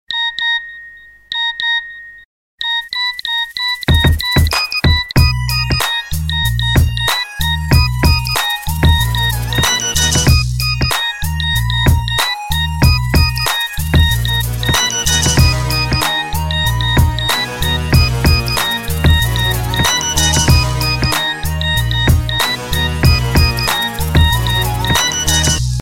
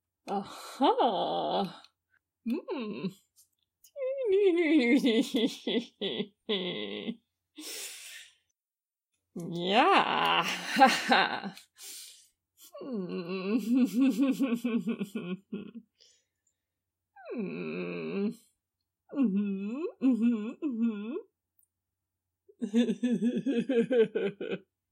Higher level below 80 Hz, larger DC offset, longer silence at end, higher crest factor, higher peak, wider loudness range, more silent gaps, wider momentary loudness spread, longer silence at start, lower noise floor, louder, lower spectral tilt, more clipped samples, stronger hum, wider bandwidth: first, -22 dBFS vs -84 dBFS; neither; second, 0 s vs 0.3 s; second, 14 dB vs 24 dB; first, 0 dBFS vs -6 dBFS; second, 1 LU vs 12 LU; first, 2.25-2.58 s vs none; second, 5 LU vs 18 LU; second, 0.1 s vs 0.25 s; second, -38 dBFS vs under -90 dBFS; first, -14 LUFS vs -30 LUFS; second, -3.5 dB/octave vs -5 dB/octave; neither; neither; about the same, 17 kHz vs 16 kHz